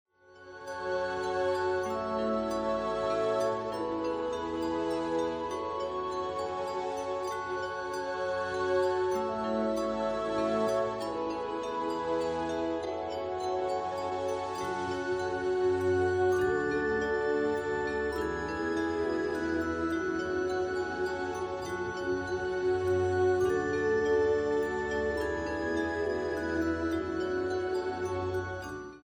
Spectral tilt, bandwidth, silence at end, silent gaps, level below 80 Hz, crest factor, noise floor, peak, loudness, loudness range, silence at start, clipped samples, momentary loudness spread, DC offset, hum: -5.5 dB/octave; 12 kHz; 0.05 s; none; -54 dBFS; 14 dB; -52 dBFS; -18 dBFS; -31 LUFS; 4 LU; 0.3 s; under 0.1%; 6 LU; under 0.1%; none